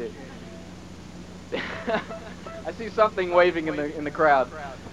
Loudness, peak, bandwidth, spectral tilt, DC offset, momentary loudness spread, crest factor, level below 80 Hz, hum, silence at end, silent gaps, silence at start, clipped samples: -24 LUFS; -6 dBFS; 11.5 kHz; -5.5 dB/octave; 0.3%; 21 LU; 20 dB; -52 dBFS; none; 0 s; none; 0 s; under 0.1%